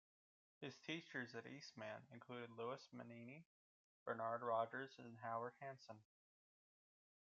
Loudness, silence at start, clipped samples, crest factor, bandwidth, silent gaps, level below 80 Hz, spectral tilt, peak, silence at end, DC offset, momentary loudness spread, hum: -51 LUFS; 0.6 s; under 0.1%; 22 dB; 7.4 kHz; 3.46-4.06 s; under -90 dBFS; -3.5 dB/octave; -30 dBFS; 1.2 s; under 0.1%; 14 LU; none